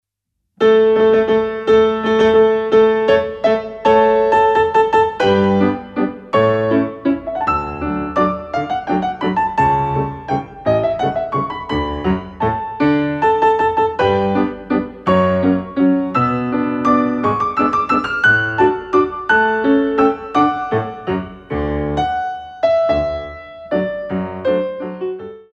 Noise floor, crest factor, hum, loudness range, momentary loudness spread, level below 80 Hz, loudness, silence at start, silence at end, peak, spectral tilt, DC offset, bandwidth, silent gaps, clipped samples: -75 dBFS; 14 dB; none; 6 LU; 9 LU; -40 dBFS; -16 LUFS; 0.6 s; 0.15 s; 0 dBFS; -7.5 dB/octave; under 0.1%; 8 kHz; none; under 0.1%